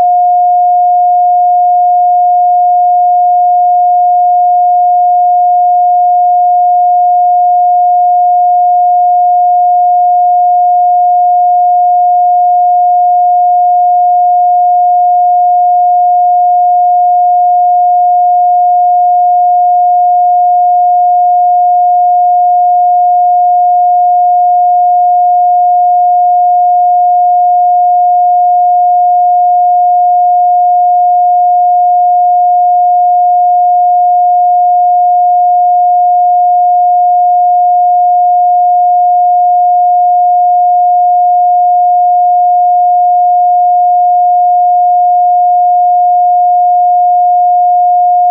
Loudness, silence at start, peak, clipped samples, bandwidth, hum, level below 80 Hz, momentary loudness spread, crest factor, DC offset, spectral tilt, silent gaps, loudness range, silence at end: -7 LUFS; 0 s; -4 dBFS; under 0.1%; 0.8 kHz; none; under -90 dBFS; 0 LU; 4 dB; under 0.1%; -8.5 dB/octave; none; 0 LU; 0 s